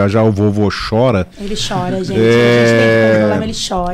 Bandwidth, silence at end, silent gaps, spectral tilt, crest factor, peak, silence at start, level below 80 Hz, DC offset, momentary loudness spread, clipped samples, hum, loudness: 14 kHz; 0 s; none; -6 dB/octave; 10 dB; -2 dBFS; 0 s; -34 dBFS; under 0.1%; 9 LU; under 0.1%; none; -13 LUFS